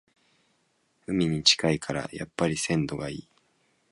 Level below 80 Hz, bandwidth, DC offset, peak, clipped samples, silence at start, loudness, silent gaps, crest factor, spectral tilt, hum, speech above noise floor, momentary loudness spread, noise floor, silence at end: -56 dBFS; 11.5 kHz; under 0.1%; -4 dBFS; under 0.1%; 1.1 s; -26 LUFS; none; 24 dB; -4 dB/octave; none; 44 dB; 16 LU; -71 dBFS; 0.7 s